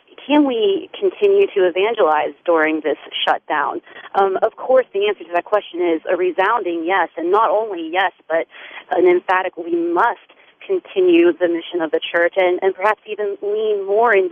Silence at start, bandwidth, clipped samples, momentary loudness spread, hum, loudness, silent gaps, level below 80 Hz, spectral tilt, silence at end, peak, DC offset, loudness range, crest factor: 0.2 s; 4.5 kHz; under 0.1%; 8 LU; none; -18 LUFS; none; -70 dBFS; -6 dB/octave; 0 s; -2 dBFS; under 0.1%; 2 LU; 16 dB